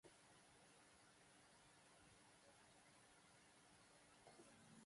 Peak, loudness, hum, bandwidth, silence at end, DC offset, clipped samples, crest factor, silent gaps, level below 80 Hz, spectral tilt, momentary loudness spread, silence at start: -52 dBFS; -69 LUFS; none; 11.5 kHz; 0 s; under 0.1%; under 0.1%; 18 dB; none; -90 dBFS; -3 dB/octave; 3 LU; 0.05 s